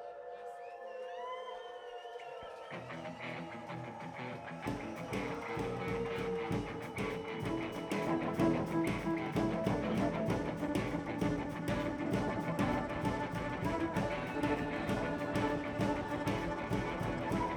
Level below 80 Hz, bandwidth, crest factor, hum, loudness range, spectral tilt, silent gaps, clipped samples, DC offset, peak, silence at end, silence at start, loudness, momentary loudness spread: -54 dBFS; 19.5 kHz; 18 dB; none; 10 LU; -6.5 dB/octave; none; under 0.1%; under 0.1%; -18 dBFS; 0 s; 0 s; -37 LUFS; 12 LU